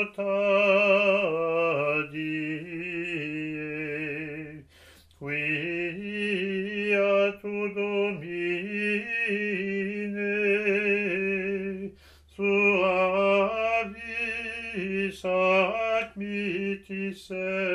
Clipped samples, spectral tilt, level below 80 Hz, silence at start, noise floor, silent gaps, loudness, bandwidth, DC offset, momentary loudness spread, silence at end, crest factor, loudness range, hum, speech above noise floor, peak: under 0.1%; -6 dB/octave; -62 dBFS; 0 s; -55 dBFS; none; -27 LUFS; 11.5 kHz; under 0.1%; 11 LU; 0 s; 18 dB; 6 LU; none; 30 dB; -10 dBFS